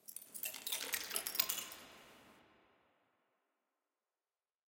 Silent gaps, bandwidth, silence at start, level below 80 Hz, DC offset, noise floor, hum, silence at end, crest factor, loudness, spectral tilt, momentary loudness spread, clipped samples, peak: none; 17 kHz; 0.1 s; -84 dBFS; under 0.1%; under -90 dBFS; none; 2.25 s; 34 dB; -39 LUFS; 1.5 dB/octave; 18 LU; under 0.1%; -12 dBFS